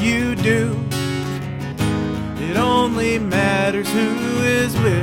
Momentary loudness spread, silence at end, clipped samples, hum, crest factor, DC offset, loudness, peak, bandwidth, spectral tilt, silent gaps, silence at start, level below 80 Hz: 7 LU; 0 s; under 0.1%; none; 16 dB; under 0.1%; -19 LUFS; -4 dBFS; 17 kHz; -5.5 dB/octave; none; 0 s; -40 dBFS